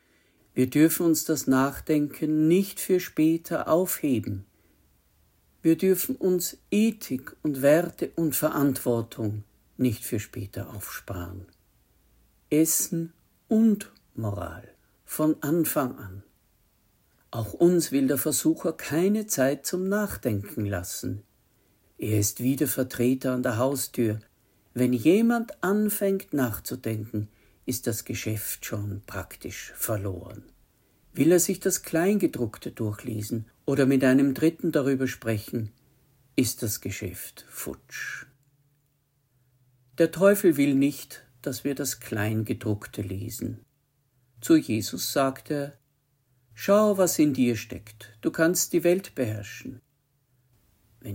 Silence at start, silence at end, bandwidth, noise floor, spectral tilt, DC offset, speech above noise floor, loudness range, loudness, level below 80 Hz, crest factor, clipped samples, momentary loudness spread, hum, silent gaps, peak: 0.55 s; 0 s; 16.5 kHz; -70 dBFS; -5 dB/octave; under 0.1%; 45 dB; 7 LU; -26 LUFS; -60 dBFS; 20 dB; under 0.1%; 15 LU; none; none; -8 dBFS